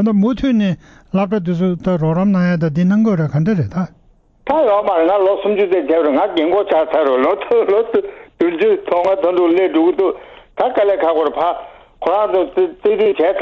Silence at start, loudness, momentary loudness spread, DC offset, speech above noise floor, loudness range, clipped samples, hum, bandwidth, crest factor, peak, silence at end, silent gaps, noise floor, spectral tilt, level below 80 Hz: 0 s; -15 LUFS; 6 LU; under 0.1%; 33 dB; 2 LU; under 0.1%; none; 6.8 kHz; 12 dB; -2 dBFS; 0 s; none; -47 dBFS; -9 dB/octave; -46 dBFS